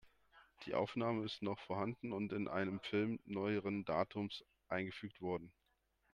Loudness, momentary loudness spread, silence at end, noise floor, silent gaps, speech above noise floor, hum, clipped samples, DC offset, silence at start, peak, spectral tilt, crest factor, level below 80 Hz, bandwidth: -42 LUFS; 7 LU; 0.65 s; -81 dBFS; none; 39 dB; none; under 0.1%; under 0.1%; 0.05 s; -22 dBFS; -7.5 dB/octave; 20 dB; -76 dBFS; 10 kHz